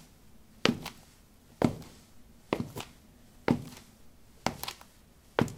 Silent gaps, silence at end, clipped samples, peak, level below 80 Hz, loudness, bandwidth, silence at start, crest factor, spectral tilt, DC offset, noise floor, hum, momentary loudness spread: none; 0 s; under 0.1%; -2 dBFS; -58 dBFS; -34 LUFS; 18 kHz; 0 s; 34 dB; -5 dB/octave; under 0.1%; -58 dBFS; none; 19 LU